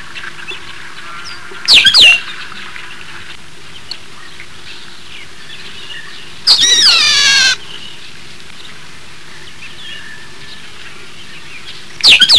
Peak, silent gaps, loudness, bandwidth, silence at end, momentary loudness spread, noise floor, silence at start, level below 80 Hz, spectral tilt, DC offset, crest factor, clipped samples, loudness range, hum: 0 dBFS; none; -6 LUFS; 11 kHz; 0 s; 27 LU; -35 dBFS; 0.15 s; -50 dBFS; 1.5 dB/octave; 5%; 16 dB; 0.3%; 20 LU; none